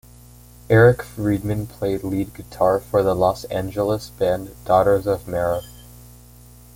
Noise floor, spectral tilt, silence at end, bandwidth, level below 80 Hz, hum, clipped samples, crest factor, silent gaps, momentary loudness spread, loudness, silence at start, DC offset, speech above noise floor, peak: -45 dBFS; -7 dB/octave; 1.05 s; 17 kHz; -44 dBFS; 60 Hz at -40 dBFS; under 0.1%; 18 dB; none; 11 LU; -20 LUFS; 0.7 s; under 0.1%; 26 dB; -2 dBFS